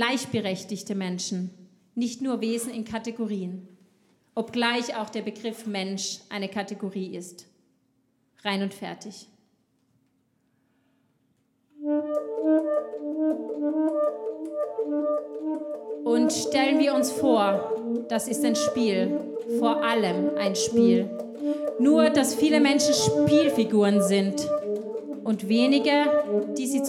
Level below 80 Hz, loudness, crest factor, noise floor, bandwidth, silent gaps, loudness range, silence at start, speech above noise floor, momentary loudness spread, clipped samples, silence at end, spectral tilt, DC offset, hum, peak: -68 dBFS; -25 LUFS; 18 dB; -69 dBFS; 15.5 kHz; none; 14 LU; 0 s; 45 dB; 12 LU; under 0.1%; 0 s; -4.5 dB/octave; under 0.1%; none; -8 dBFS